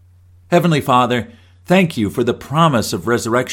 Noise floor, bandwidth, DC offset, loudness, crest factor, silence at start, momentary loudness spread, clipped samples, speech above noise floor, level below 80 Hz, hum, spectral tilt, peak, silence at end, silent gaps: -47 dBFS; 17 kHz; under 0.1%; -16 LUFS; 16 dB; 0.5 s; 5 LU; under 0.1%; 32 dB; -50 dBFS; none; -5.5 dB/octave; 0 dBFS; 0 s; none